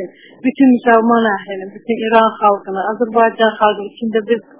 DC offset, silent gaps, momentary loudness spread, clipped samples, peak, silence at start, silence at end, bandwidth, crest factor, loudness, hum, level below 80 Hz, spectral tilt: 0.1%; none; 11 LU; under 0.1%; 0 dBFS; 0 s; 0.2 s; 4 kHz; 14 dB; -14 LUFS; none; -60 dBFS; -9 dB/octave